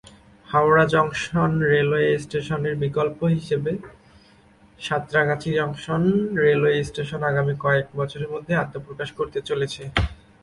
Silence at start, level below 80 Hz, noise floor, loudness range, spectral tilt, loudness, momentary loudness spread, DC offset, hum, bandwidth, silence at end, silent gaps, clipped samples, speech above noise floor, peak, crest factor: 0.5 s; -44 dBFS; -53 dBFS; 4 LU; -6.5 dB/octave; -22 LUFS; 10 LU; under 0.1%; none; 11.5 kHz; 0.3 s; none; under 0.1%; 31 dB; -2 dBFS; 20 dB